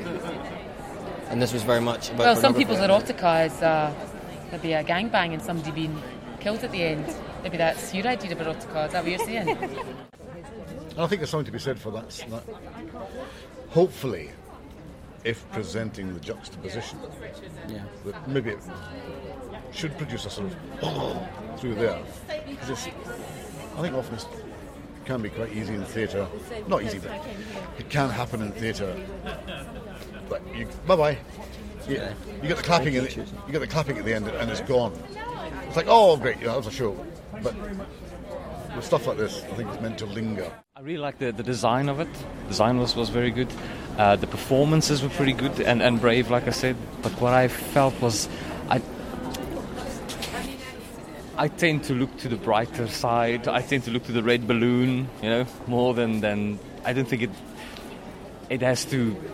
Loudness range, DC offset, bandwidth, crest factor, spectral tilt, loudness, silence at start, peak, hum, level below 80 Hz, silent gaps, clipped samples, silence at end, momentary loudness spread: 11 LU; under 0.1%; 16 kHz; 24 dB; -5.5 dB/octave; -26 LUFS; 0 s; -4 dBFS; none; -46 dBFS; none; under 0.1%; 0 s; 17 LU